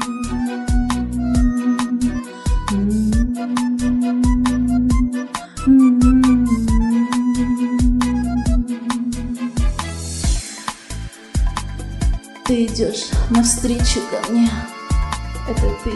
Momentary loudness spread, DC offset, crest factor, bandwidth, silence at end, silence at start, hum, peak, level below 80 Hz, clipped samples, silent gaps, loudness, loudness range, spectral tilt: 10 LU; under 0.1%; 16 dB; 12 kHz; 0 s; 0 s; none; -2 dBFS; -24 dBFS; under 0.1%; none; -19 LUFS; 7 LU; -5.5 dB/octave